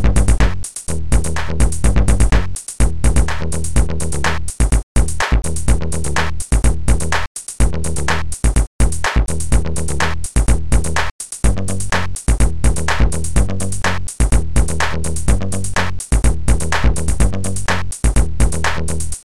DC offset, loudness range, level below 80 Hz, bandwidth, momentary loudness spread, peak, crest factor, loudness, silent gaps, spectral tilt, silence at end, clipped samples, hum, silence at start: 10%; 1 LU; -18 dBFS; 13 kHz; 4 LU; -2 dBFS; 14 dB; -18 LUFS; 4.83-4.95 s, 7.27-7.35 s, 8.67-8.79 s, 11.11-11.19 s; -4.5 dB/octave; 0.1 s; under 0.1%; none; 0 s